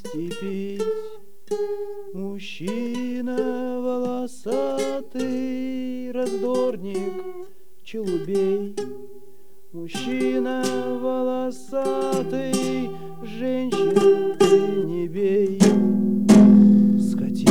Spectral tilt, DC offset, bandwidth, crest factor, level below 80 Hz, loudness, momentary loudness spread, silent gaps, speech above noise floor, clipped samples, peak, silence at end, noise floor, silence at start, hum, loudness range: -6.5 dB/octave; 2%; 14 kHz; 16 dB; -60 dBFS; -22 LUFS; 15 LU; none; 28 dB; under 0.1%; -4 dBFS; 0 s; -53 dBFS; 0.05 s; none; 12 LU